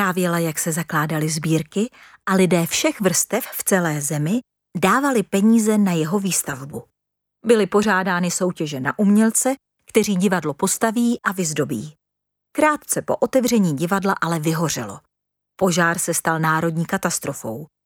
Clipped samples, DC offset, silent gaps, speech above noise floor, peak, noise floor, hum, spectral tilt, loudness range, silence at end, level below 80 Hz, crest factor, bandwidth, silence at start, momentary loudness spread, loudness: under 0.1%; under 0.1%; none; 61 dB; -2 dBFS; -81 dBFS; none; -4.5 dB/octave; 2 LU; 0.2 s; -60 dBFS; 18 dB; 18.5 kHz; 0 s; 10 LU; -20 LUFS